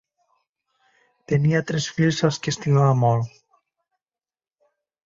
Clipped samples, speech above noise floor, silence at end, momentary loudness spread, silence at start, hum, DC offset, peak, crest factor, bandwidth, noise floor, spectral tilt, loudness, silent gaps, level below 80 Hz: under 0.1%; over 70 dB; 1.75 s; 7 LU; 1.3 s; none; under 0.1%; -6 dBFS; 18 dB; 7.8 kHz; under -90 dBFS; -6 dB/octave; -21 LUFS; none; -58 dBFS